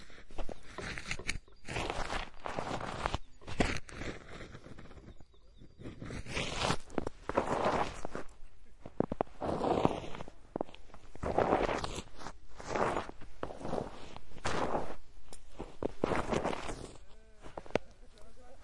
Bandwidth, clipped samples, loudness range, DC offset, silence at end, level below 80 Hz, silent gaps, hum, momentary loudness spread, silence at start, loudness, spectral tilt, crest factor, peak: 11.5 kHz; under 0.1%; 5 LU; under 0.1%; 0 s; -48 dBFS; none; none; 19 LU; 0 s; -37 LUFS; -5 dB/octave; 28 dB; -10 dBFS